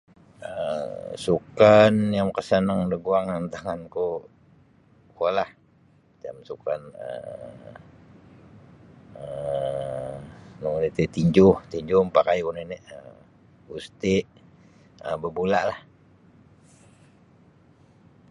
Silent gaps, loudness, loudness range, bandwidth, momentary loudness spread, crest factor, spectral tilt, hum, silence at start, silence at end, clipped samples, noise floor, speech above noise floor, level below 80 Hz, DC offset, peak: none; -24 LUFS; 13 LU; 11 kHz; 23 LU; 22 dB; -7 dB/octave; none; 0.4 s; 2.5 s; under 0.1%; -59 dBFS; 35 dB; -54 dBFS; under 0.1%; -4 dBFS